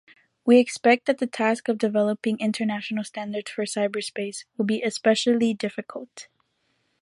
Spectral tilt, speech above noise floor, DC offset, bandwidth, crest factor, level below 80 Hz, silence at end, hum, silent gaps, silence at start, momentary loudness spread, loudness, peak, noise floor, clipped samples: -4.5 dB/octave; 48 dB; under 0.1%; 11.5 kHz; 20 dB; -74 dBFS; 0.8 s; none; none; 0.45 s; 13 LU; -24 LUFS; -4 dBFS; -71 dBFS; under 0.1%